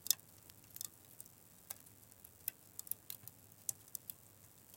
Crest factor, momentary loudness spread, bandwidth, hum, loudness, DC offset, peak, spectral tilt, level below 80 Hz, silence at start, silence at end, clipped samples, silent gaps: 38 dB; 15 LU; 17 kHz; none; -46 LUFS; under 0.1%; -10 dBFS; 0 dB/octave; -82 dBFS; 0 s; 0 s; under 0.1%; none